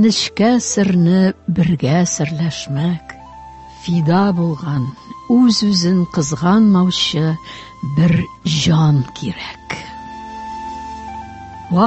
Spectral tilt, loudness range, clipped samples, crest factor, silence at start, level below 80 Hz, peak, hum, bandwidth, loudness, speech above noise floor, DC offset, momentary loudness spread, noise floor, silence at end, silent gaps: -5.5 dB/octave; 5 LU; under 0.1%; 14 dB; 0 s; -44 dBFS; -2 dBFS; none; 8.4 kHz; -16 LUFS; 21 dB; under 0.1%; 18 LU; -36 dBFS; 0 s; none